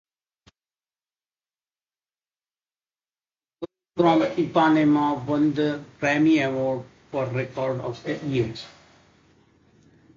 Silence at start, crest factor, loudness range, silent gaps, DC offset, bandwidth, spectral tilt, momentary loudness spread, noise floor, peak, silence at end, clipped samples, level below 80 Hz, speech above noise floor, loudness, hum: 3.6 s; 20 dB; 9 LU; none; under 0.1%; 7.4 kHz; -7 dB/octave; 15 LU; under -90 dBFS; -6 dBFS; 1.5 s; under 0.1%; -62 dBFS; over 68 dB; -23 LUFS; none